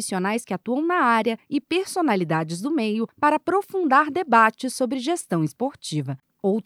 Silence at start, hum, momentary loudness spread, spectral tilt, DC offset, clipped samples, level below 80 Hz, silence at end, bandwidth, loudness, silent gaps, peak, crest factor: 0 s; none; 9 LU; -5 dB/octave; under 0.1%; under 0.1%; -72 dBFS; 0.05 s; 16 kHz; -23 LUFS; none; -4 dBFS; 18 dB